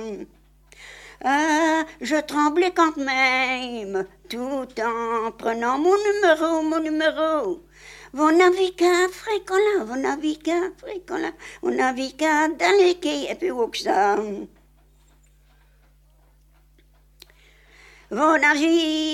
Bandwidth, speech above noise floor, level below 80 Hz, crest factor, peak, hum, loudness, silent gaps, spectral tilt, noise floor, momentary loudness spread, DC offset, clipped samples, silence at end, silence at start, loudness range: 14.5 kHz; 34 dB; -56 dBFS; 20 dB; -4 dBFS; 50 Hz at -55 dBFS; -21 LUFS; none; -3 dB/octave; -56 dBFS; 13 LU; under 0.1%; under 0.1%; 0 s; 0 s; 6 LU